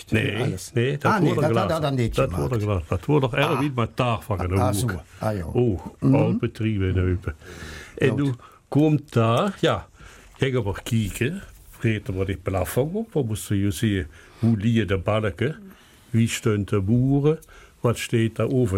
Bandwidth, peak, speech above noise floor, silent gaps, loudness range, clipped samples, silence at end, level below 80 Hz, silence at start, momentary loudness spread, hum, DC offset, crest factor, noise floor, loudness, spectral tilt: 16.5 kHz; -8 dBFS; 24 dB; none; 3 LU; under 0.1%; 0 s; -44 dBFS; 0 s; 8 LU; none; under 0.1%; 16 dB; -47 dBFS; -23 LUFS; -6.5 dB/octave